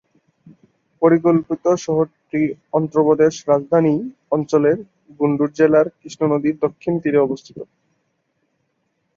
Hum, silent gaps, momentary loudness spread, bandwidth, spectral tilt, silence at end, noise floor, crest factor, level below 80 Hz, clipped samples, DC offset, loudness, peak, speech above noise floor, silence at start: none; none; 8 LU; 7.4 kHz; -7.5 dB/octave; 1.55 s; -70 dBFS; 16 dB; -62 dBFS; under 0.1%; under 0.1%; -18 LUFS; -2 dBFS; 52 dB; 1 s